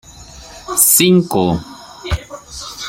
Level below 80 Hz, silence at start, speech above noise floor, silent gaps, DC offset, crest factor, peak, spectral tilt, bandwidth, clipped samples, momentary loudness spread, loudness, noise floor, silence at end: -34 dBFS; 0.1 s; 24 dB; none; under 0.1%; 16 dB; 0 dBFS; -3.5 dB/octave; 17 kHz; under 0.1%; 24 LU; -13 LUFS; -37 dBFS; 0 s